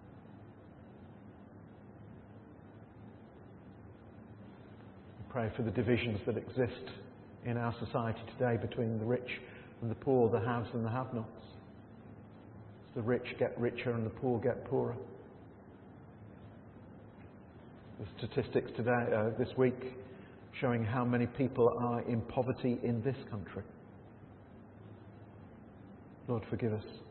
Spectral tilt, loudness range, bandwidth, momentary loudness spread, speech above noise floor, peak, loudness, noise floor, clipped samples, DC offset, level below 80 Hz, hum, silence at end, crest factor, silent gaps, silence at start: -7 dB/octave; 19 LU; 4.3 kHz; 22 LU; 20 dB; -16 dBFS; -35 LUFS; -55 dBFS; under 0.1%; under 0.1%; -66 dBFS; none; 0 s; 22 dB; none; 0 s